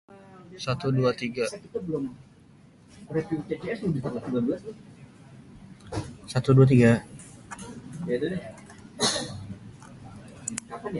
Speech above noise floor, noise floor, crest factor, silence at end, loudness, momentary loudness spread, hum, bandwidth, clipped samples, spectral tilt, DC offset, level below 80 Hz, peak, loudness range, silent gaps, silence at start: 29 dB; -54 dBFS; 22 dB; 0 s; -27 LUFS; 25 LU; none; 11.5 kHz; under 0.1%; -6 dB/octave; under 0.1%; -56 dBFS; -6 dBFS; 8 LU; none; 0.1 s